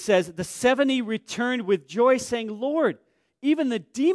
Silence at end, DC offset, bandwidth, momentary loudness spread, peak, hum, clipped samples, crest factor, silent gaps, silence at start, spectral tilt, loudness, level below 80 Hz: 0 s; under 0.1%; 11 kHz; 8 LU; -8 dBFS; none; under 0.1%; 16 dB; none; 0 s; -4.5 dB/octave; -24 LUFS; -64 dBFS